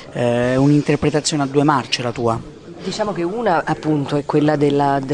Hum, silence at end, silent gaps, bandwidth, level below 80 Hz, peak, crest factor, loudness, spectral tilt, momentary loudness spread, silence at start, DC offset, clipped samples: none; 0 s; none; 10.5 kHz; -48 dBFS; 0 dBFS; 18 dB; -18 LUFS; -5.5 dB/octave; 7 LU; 0 s; under 0.1%; under 0.1%